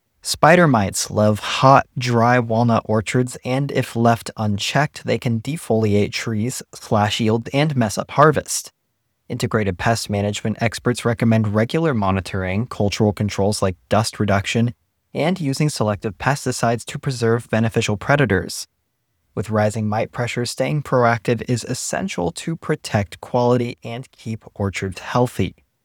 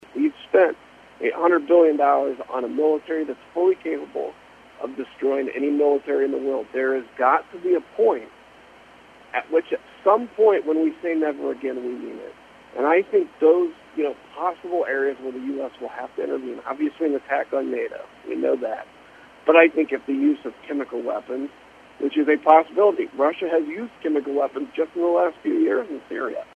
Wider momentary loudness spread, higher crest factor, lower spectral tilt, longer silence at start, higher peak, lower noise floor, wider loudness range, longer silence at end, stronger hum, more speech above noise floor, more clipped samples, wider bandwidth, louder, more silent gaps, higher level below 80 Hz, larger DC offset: second, 9 LU vs 14 LU; about the same, 20 dB vs 22 dB; about the same, -5.5 dB/octave vs -6 dB/octave; about the same, 0.25 s vs 0.15 s; about the same, 0 dBFS vs 0 dBFS; first, -72 dBFS vs -49 dBFS; about the same, 4 LU vs 5 LU; first, 0.3 s vs 0.1 s; neither; first, 52 dB vs 27 dB; neither; first, 17.5 kHz vs 7.2 kHz; first, -19 LUFS vs -22 LUFS; neither; first, -50 dBFS vs -68 dBFS; neither